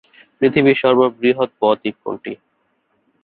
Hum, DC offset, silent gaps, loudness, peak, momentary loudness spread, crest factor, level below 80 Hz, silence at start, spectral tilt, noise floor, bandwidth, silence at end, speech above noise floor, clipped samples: none; under 0.1%; none; -16 LUFS; -2 dBFS; 15 LU; 16 dB; -60 dBFS; 0.4 s; -10.5 dB/octave; -65 dBFS; 4.5 kHz; 0.9 s; 49 dB; under 0.1%